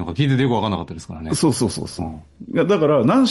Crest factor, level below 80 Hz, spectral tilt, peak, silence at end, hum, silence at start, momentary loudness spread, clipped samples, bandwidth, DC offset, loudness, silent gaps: 12 dB; -48 dBFS; -6 dB/octave; -6 dBFS; 0 s; none; 0 s; 16 LU; under 0.1%; 11.5 kHz; under 0.1%; -19 LUFS; none